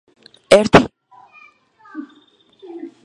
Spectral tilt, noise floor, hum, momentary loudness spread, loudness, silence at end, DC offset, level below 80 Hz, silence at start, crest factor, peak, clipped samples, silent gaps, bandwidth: -5 dB/octave; -53 dBFS; none; 25 LU; -13 LUFS; 0.2 s; under 0.1%; -44 dBFS; 0.5 s; 20 dB; 0 dBFS; 0.1%; none; 13 kHz